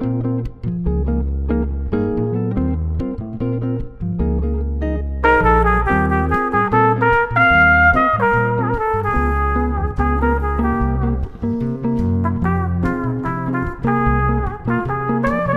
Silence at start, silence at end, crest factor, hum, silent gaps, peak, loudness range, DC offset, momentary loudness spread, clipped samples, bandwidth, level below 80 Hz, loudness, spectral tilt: 0 s; 0 s; 16 dB; none; none; -2 dBFS; 7 LU; under 0.1%; 9 LU; under 0.1%; 5.2 kHz; -24 dBFS; -18 LUFS; -9 dB/octave